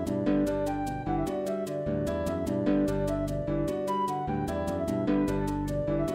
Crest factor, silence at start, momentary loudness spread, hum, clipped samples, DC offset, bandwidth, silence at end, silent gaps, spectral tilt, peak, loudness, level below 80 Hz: 14 dB; 0 s; 4 LU; none; under 0.1%; under 0.1%; 16 kHz; 0 s; none; -7.5 dB/octave; -14 dBFS; -30 LUFS; -44 dBFS